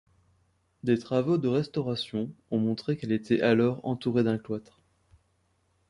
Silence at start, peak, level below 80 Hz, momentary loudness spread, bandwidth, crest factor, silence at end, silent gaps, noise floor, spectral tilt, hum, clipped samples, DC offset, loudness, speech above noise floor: 0.85 s; -10 dBFS; -64 dBFS; 9 LU; 11 kHz; 20 dB; 1.3 s; none; -71 dBFS; -7.5 dB/octave; none; under 0.1%; under 0.1%; -28 LUFS; 44 dB